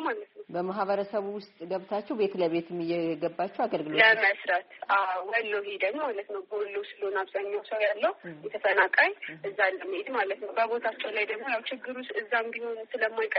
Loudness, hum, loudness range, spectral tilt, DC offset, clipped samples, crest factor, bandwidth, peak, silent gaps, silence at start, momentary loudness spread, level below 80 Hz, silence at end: -29 LUFS; none; 5 LU; -1.5 dB/octave; under 0.1%; under 0.1%; 22 dB; 5.6 kHz; -8 dBFS; none; 0 s; 13 LU; -80 dBFS; 0 s